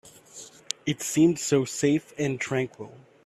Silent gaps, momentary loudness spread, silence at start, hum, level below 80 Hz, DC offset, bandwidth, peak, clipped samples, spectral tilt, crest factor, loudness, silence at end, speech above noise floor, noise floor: none; 22 LU; 0.05 s; none; -66 dBFS; under 0.1%; 14.5 kHz; -6 dBFS; under 0.1%; -4.5 dB/octave; 22 dB; -26 LUFS; 0.3 s; 22 dB; -48 dBFS